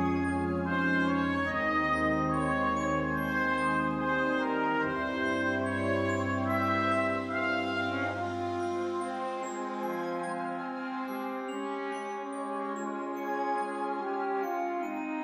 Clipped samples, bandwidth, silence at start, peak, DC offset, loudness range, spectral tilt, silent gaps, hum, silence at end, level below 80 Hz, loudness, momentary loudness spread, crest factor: under 0.1%; 13 kHz; 0 s; -16 dBFS; under 0.1%; 6 LU; -6 dB/octave; none; none; 0 s; -56 dBFS; -31 LUFS; 8 LU; 14 dB